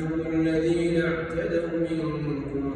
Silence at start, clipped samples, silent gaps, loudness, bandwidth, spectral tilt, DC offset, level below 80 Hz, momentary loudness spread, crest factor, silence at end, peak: 0 s; under 0.1%; none; -26 LUFS; 9.6 kHz; -7.5 dB/octave; under 0.1%; -46 dBFS; 6 LU; 14 dB; 0 s; -12 dBFS